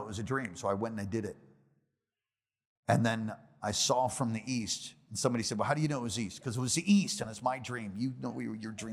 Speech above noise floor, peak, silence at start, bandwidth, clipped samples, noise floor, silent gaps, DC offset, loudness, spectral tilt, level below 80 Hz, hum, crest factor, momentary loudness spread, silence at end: over 57 dB; -12 dBFS; 0 s; 15 kHz; under 0.1%; under -90 dBFS; 2.67-2.83 s; under 0.1%; -33 LUFS; -4.5 dB/octave; -70 dBFS; none; 22 dB; 11 LU; 0 s